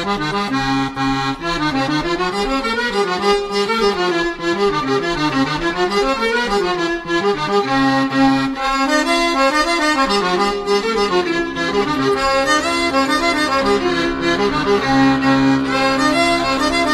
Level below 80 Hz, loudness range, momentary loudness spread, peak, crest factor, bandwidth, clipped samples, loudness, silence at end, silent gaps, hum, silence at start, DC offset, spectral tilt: -38 dBFS; 2 LU; 4 LU; -2 dBFS; 14 dB; 13.5 kHz; under 0.1%; -16 LUFS; 0 s; none; none; 0 s; under 0.1%; -4 dB/octave